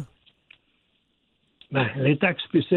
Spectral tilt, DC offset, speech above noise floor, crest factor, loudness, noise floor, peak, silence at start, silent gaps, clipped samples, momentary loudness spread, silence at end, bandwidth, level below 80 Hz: -9 dB/octave; under 0.1%; 48 dB; 20 dB; -24 LUFS; -70 dBFS; -6 dBFS; 0 s; none; under 0.1%; 8 LU; 0 s; 4.3 kHz; -66 dBFS